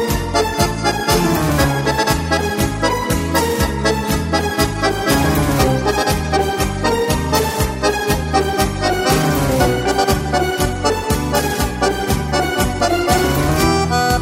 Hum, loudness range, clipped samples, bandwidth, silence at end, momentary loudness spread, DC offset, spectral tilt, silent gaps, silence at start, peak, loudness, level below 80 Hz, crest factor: none; 1 LU; under 0.1%; 16.5 kHz; 0 s; 3 LU; under 0.1%; -4.5 dB/octave; none; 0 s; -2 dBFS; -17 LUFS; -26 dBFS; 14 dB